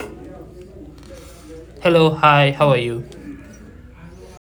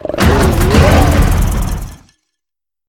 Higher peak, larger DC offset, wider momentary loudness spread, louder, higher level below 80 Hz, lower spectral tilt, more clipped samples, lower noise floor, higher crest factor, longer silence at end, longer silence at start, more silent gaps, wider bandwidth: about the same, 0 dBFS vs 0 dBFS; neither; first, 26 LU vs 14 LU; second, -15 LUFS vs -11 LUFS; second, -44 dBFS vs -16 dBFS; about the same, -6.5 dB/octave vs -6 dB/octave; second, under 0.1% vs 0.3%; second, -41 dBFS vs -86 dBFS; first, 20 dB vs 12 dB; second, 0.35 s vs 0.95 s; about the same, 0 s vs 0.05 s; neither; first, 19.5 kHz vs 17.5 kHz